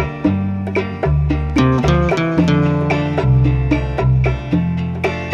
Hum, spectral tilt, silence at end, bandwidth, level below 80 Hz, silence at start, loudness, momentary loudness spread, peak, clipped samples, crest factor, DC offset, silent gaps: none; -8 dB/octave; 0 s; 7.4 kHz; -24 dBFS; 0 s; -16 LUFS; 6 LU; -2 dBFS; under 0.1%; 14 dB; under 0.1%; none